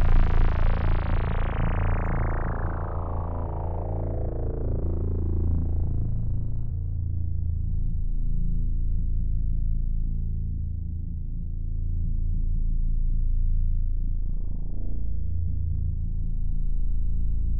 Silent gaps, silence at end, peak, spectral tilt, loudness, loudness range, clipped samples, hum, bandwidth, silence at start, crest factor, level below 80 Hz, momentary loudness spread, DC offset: none; 0 s; -10 dBFS; -10.5 dB/octave; -30 LUFS; 3 LU; under 0.1%; none; 3.4 kHz; 0 s; 14 dB; -26 dBFS; 6 LU; under 0.1%